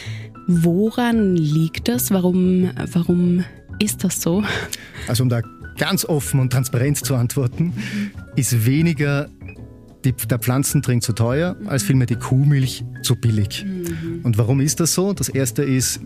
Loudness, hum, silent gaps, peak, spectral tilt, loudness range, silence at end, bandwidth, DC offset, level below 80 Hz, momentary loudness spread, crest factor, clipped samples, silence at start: -19 LUFS; none; none; -2 dBFS; -5.5 dB/octave; 2 LU; 0 s; 15.5 kHz; under 0.1%; -44 dBFS; 8 LU; 16 dB; under 0.1%; 0 s